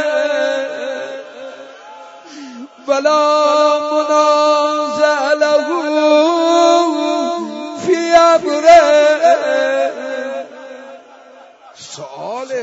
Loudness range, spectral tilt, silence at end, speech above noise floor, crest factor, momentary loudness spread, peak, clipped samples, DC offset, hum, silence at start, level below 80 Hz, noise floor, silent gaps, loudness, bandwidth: 7 LU; -2.5 dB/octave; 0 s; 29 dB; 14 dB; 22 LU; 0 dBFS; under 0.1%; under 0.1%; none; 0 s; -56 dBFS; -41 dBFS; none; -13 LUFS; 8 kHz